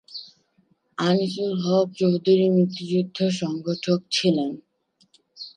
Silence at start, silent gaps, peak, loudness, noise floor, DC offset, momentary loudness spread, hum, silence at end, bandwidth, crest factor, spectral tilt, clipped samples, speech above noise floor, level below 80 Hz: 0.1 s; none; -8 dBFS; -23 LUFS; -65 dBFS; under 0.1%; 18 LU; none; 0.1 s; 10 kHz; 16 dB; -6 dB/octave; under 0.1%; 43 dB; -72 dBFS